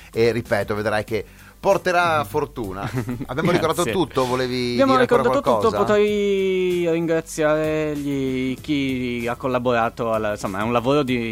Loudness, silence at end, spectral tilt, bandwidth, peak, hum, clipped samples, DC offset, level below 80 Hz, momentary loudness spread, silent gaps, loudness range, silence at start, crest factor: -21 LUFS; 0 s; -5.5 dB/octave; 16.5 kHz; -4 dBFS; none; under 0.1%; under 0.1%; -46 dBFS; 7 LU; none; 3 LU; 0 s; 16 dB